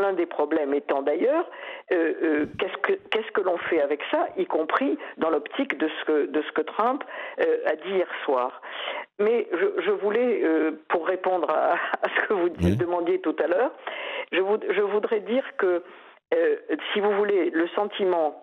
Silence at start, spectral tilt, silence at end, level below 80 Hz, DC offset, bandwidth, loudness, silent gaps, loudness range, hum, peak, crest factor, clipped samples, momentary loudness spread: 0 s; -7.5 dB/octave; 0 s; -58 dBFS; under 0.1%; 6.4 kHz; -25 LUFS; none; 2 LU; none; -6 dBFS; 18 dB; under 0.1%; 5 LU